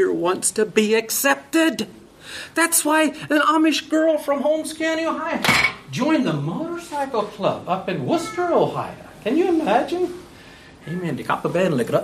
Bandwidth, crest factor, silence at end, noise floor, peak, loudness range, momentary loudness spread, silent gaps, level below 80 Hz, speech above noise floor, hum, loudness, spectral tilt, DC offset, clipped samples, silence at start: 15.5 kHz; 18 dB; 0 s; -44 dBFS; -2 dBFS; 4 LU; 11 LU; none; -56 dBFS; 23 dB; none; -20 LUFS; -4 dB/octave; under 0.1%; under 0.1%; 0 s